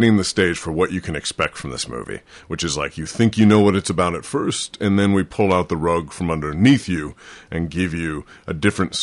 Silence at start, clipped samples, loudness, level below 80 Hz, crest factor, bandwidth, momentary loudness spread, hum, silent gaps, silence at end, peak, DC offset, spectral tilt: 0 s; under 0.1%; -20 LUFS; -40 dBFS; 16 dB; 11.5 kHz; 12 LU; none; none; 0 s; -4 dBFS; under 0.1%; -5.5 dB/octave